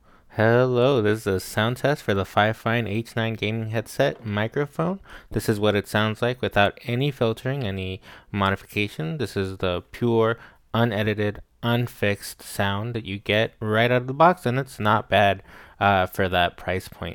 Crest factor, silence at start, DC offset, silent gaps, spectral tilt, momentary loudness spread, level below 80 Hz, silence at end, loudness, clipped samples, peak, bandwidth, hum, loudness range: 20 dB; 0.35 s; under 0.1%; none; -6 dB/octave; 10 LU; -52 dBFS; 0 s; -24 LUFS; under 0.1%; -4 dBFS; 19 kHz; none; 4 LU